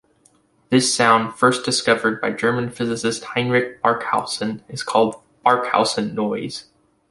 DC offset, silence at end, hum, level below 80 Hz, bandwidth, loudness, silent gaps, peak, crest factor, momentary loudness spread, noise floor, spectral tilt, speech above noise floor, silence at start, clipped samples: under 0.1%; 0.5 s; none; -60 dBFS; 11.5 kHz; -20 LUFS; none; -2 dBFS; 20 dB; 9 LU; -58 dBFS; -3.5 dB/octave; 39 dB; 0.7 s; under 0.1%